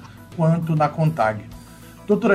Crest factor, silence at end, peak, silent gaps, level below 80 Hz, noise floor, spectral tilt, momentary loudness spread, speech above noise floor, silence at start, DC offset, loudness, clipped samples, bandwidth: 18 dB; 0 s; -4 dBFS; none; -52 dBFS; -42 dBFS; -8.5 dB/octave; 21 LU; 23 dB; 0 s; under 0.1%; -21 LUFS; under 0.1%; 13.5 kHz